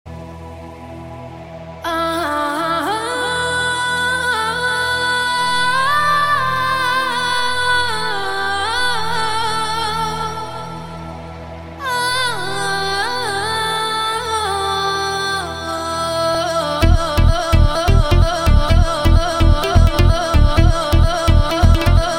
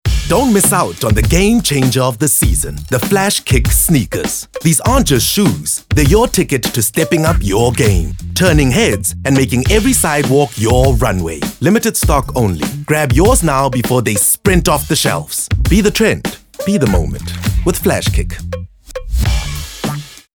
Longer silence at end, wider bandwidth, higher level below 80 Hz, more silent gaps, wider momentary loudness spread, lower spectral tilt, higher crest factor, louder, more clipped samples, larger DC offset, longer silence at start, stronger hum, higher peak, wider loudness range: second, 0 s vs 0.2 s; second, 16.5 kHz vs over 20 kHz; about the same, -20 dBFS vs -22 dBFS; neither; first, 16 LU vs 9 LU; about the same, -4.5 dB/octave vs -4.5 dB/octave; about the same, 16 dB vs 12 dB; second, -17 LUFS vs -13 LUFS; neither; neither; about the same, 0.05 s vs 0.05 s; neither; about the same, 0 dBFS vs 0 dBFS; first, 6 LU vs 3 LU